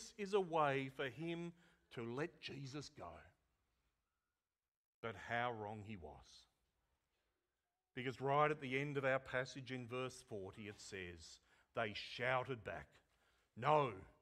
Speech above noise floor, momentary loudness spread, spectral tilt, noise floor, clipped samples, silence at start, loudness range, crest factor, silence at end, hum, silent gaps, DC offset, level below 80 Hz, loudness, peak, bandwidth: over 47 dB; 17 LU; -5.5 dB/octave; under -90 dBFS; under 0.1%; 0 s; 9 LU; 24 dB; 0.1 s; none; 4.68-5.03 s; under 0.1%; -74 dBFS; -43 LUFS; -22 dBFS; 13.5 kHz